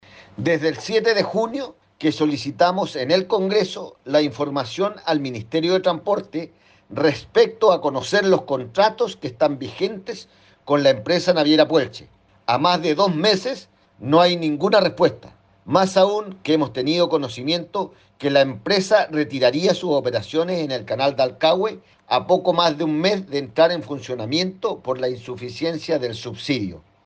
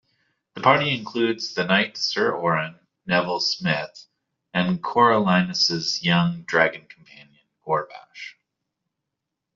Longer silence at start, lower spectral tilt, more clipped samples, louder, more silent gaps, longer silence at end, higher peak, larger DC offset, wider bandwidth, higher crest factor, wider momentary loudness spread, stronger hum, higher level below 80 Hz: second, 0.15 s vs 0.55 s; about the same, -5 dB/octave vs -4.5 dB/octave; neither; about the same, -20 LUFS vs -22 LUFS; neither; second, 0.25 s vs 1.25 s; about the same, -4 dBFS vs -4 dBFS; neither; first, 9.2 kHz vs 7.4 kHz; about the same, 18 dB vs 20 dB; second, 11 LU vs 20 LU; neither; about the same, -62 dBFS vs -64 dBFS